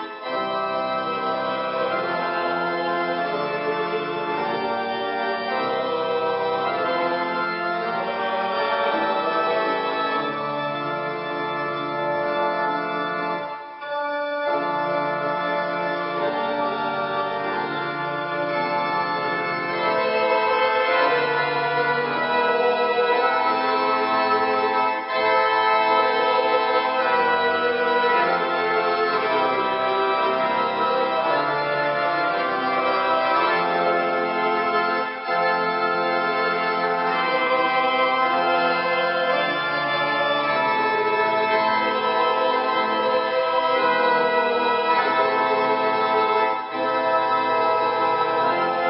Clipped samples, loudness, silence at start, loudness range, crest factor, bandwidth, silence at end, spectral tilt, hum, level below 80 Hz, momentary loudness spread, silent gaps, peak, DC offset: under 0.1%; -22 LUFS; 0 s; 5 LU; 16 dB; 5.8 kHz; 0 s; -9 dB/octave; none; -68 dBFS; 6 LU; none; -6 dBFS; under 0.1%